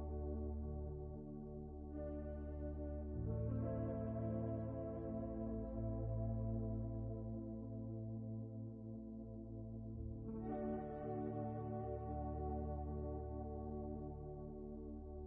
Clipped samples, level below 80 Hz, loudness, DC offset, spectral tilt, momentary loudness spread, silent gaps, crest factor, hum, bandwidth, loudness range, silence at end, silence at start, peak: under 0.1%; -52 dBFS; -46 LUFS; under 0.1%; -9.5 dB/octave; 8 LU; none; 14 dB; none; 2.7 kHz; 4 LU; 0 s; 0 s; -30 dBFS